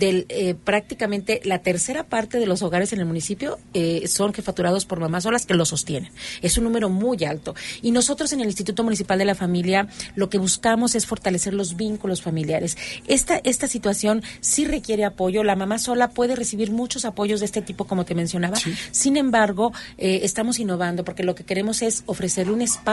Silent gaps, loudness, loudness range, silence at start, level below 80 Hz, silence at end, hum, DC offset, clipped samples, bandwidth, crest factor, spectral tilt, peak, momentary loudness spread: none; -22 LUFS; 2 LU; 0 s; -46 dBFS; 0 s; none; under 0.1%; under 0.1%; 12 kHz; 18 dB; -4 dB/octave; -4 dBFS; 7 LU